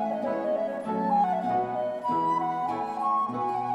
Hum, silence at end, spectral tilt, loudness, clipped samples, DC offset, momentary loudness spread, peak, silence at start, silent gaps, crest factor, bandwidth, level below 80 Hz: none; 0 s; -7.5 dB/octave; -28 LUFS; under 0.1%; under 0.1%; 5 LU; -16 dBFS; 0 s; none; 12 dB; 11 kHz; -72 dBFS